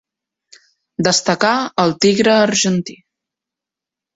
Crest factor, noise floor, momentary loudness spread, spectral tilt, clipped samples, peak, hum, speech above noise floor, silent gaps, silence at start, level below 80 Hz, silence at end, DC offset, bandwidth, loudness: 16 dB; -86 dBFS; 9 LU; -3.5 dB/octave; under 0.1%; -2 dBFS; none; 71 dB; none; 1 s; -58 dBFS; 1.25 s; under 0.1%; 8.2 kHz; -15 LUFS